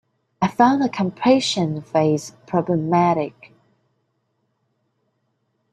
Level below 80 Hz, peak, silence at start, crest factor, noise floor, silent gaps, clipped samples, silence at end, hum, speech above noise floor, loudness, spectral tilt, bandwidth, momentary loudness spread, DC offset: -62 dBFS; -2 dBFS; 0.4 s; 20 dB; -71 dBFS; none; under 0.1%; 2.45 s; none; 52 dB; -20 LUFS; -6 dB/octave; 12 kHz; 8 LU; under 0.1%